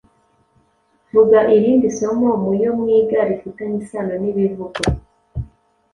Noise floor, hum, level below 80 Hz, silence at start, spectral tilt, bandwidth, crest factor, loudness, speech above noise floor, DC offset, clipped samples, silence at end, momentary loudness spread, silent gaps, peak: -60 dBFS; none; -38 dBFS; 1.15 s; -6.5 dB/octave; 11.5 kHz; 16 dB; -17 LUFS; 45 dB; under 0.1%; under 0.1%; 0.5 s; 18 LU; none; -2 dBFS